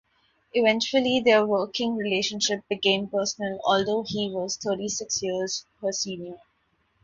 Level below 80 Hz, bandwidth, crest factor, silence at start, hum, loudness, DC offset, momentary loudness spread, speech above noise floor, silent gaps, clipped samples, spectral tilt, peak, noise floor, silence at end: -66 dBFS; 7.8 kHz; 20 dB; 0.55 s; none; -25 LUFS; under 0.1%; 8 LU; 44 dB; none; under 0.1%; -3 dB/octave; -6 dBFS; -70 dBFS; 0.7 s